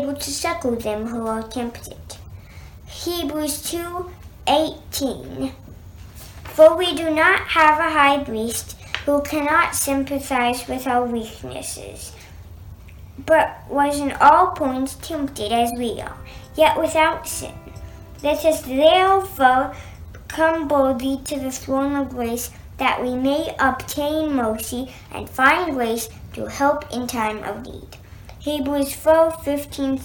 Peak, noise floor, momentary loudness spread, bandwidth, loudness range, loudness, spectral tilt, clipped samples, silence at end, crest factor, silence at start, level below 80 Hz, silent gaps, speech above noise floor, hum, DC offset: -2 dBFS; -40 dBFS; 20 LU; 19 kHz; 8 LU; -20 LUFS; -3.5 dB/octave; under 0.1%; 0 s; 18 dB; 0 s; -44 dBFS; none; 20 dB; none; under 0.1%